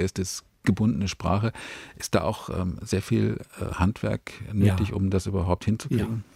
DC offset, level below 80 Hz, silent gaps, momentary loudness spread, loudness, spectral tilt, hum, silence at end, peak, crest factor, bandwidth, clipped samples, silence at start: under 0.1%; -46 dBFS; none; 9 LU; -27 LUFS; -6.5 dB/octave; none; 0.15 s; -6 dBFS; 20 dB; 15 kHz; under 0.1%; 0 s